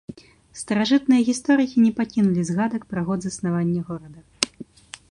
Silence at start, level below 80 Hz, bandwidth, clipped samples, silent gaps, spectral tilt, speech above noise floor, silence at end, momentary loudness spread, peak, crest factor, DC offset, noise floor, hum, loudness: 0.1 s; -58 dBFS; 11.5 kHz; under 0.1%; none; -5.5 dB/octave; 21 dB; 0.5 s; 18 LU; 0 dBFS; 22 dB; under 0.1%; -42 dBFS; none; -22 LUFS